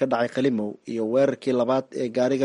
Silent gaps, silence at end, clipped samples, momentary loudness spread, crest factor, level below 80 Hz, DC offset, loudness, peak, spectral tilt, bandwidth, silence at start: none; 0 s; under 0.1%; 7 LU; 14 dB; -68 dBFS; under 0.1%; -24 LUFS; -10 dBFS; -6.5 dB/octave; 11 kHz; 0 s